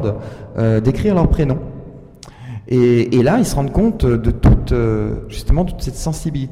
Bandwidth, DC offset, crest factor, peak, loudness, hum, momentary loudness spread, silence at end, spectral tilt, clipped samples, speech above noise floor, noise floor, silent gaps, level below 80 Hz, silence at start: 15 kHz; 0.2%; 12 dB; -4 dBFS; -16 LUFS; none; 15 LU; 0 s; -7.5 dB/octave; under 0.1%; 23 dB; -38 dBFS; none; -24 dBFS; 0 s